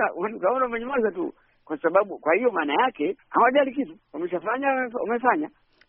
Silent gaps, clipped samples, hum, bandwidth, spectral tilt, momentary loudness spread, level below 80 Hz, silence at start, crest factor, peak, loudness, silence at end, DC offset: none; under 0.1%; none; 3.6 kHz; -2.5 dB/octave; 12 LU; -66 dBFS; 0 s; 20 dB; -6 dBFS; -24 LUFS; 0.4 s; under 0.1%